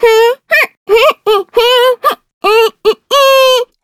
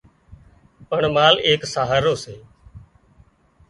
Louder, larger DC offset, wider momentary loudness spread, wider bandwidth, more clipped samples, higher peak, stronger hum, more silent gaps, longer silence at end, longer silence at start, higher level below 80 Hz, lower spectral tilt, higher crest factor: first, -9 LUFS vs -18 LUFS; neither; second, 6 LU vs 13 LU; first, 18 kHz vs 11.5 kHz; neither; about the same, 0 dBFS vs 0 dBFS; neither; first, 0.77-0.86 s, 2.33-2.41 s vs none; second, 0.2 s vs 0.9 s; second, 0 s vs 0.3 s; about the same, -48 dBFS vs -50 dBFS; second, 0 dB/octave vs -4 dB/octave; second, 10 dB vs 22 dB